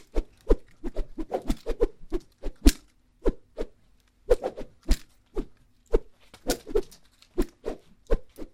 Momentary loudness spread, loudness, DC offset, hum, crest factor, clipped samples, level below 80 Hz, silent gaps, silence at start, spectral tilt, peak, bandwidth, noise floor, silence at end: 14 LU; -32 LUFS; under 0.1%; none; 26 dB; under 0.1%; -32 dBFS; none; 0.15 s; -5.5 dB/octave; -2 dBFS; 16.5 kHz; -61 dBFS; 0.05 s